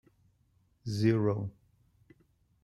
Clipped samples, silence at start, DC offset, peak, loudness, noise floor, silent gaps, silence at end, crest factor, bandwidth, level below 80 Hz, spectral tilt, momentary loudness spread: under 0.1%; 0.85 s; under 0.1%; -14 dBFS; -31 LUFS; -70 dBFS; none; 1.15 s; 20 dB; 12 kHz; -66 dBFS; -8 dB/octave; 16 LU